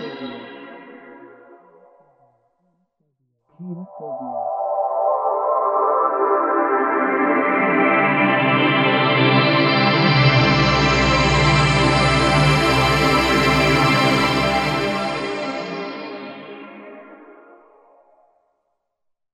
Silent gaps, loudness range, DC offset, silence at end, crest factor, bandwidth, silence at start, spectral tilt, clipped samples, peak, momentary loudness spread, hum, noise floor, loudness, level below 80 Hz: none; 15 LU; under 0.1%; 2.2 s; 16 dB; 15 kHz; 0 s; -5.5 dB/octave; under 0.1%; -2 dBFS; 18 LU; none; -73 dBFS; -17 LUFS; -36 dBFS